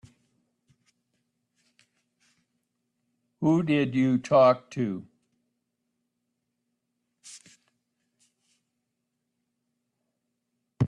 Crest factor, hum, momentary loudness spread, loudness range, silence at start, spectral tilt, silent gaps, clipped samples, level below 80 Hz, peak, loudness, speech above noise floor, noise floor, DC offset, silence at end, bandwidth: 22 dB; none; 26 LU; 12 LU; 3.4 s; -7.5 dB/octave; none; under 0.1%; -72 dBFS; -10 dBFS; -24 LUFS; 58 dB; -81 dBFS; under 0.1%; 0 s; 11 kHz